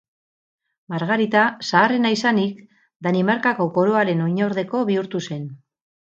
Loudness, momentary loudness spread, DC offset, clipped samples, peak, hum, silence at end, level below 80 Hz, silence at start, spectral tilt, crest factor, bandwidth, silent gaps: -20 LUFS; 10 LU; under 0.1%; under 0.1%; 0 dBFS; none; 0.55 s; -70 dBFS; 0.9 s; -6 dB/octave; 20 dB; 7.8 kHz; 2.96-3.00 s